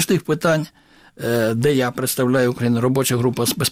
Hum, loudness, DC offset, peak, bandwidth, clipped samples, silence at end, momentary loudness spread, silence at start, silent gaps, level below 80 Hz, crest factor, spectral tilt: none; -19 LUFS; under 0.1%; -6 dBFS; 16.5 kHz; under 0.1%; 0 s; 4 LU; 0 s; none; -54 dBFS; 12 dB; -5 dB/octave